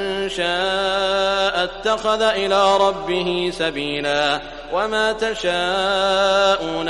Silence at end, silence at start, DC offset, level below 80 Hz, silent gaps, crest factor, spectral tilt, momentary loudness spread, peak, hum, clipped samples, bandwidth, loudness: 0 s; 0 s; under 0.1%; -44 dBFS; none; 16 dB; -3.5 dB/octave; 6 LU; -4 dBFS; none; under 0.1%; 11.5 kHz; -19 LUFS